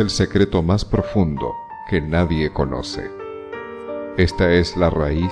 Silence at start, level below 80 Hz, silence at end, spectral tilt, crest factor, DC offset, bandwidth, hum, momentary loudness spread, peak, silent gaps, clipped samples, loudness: 0 s; -32 dBFS; 0 s; -6.5 dB/octave; 16 dB; under 0.1%; 10.5 kHz; none; 15 LU; -2 dBFS; none; under 0.1%; -20 LUFS